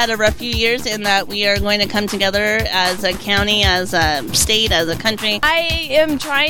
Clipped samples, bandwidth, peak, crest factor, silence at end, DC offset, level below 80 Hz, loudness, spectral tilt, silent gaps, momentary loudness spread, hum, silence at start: under 0.1%; 17.5 kHz; -2 dBFS; 16 dB; 0 s; under 0.1%; -32 dBFS; -15 LUFS; -2.5 dB/octave; none; 4 LU; none; 0 s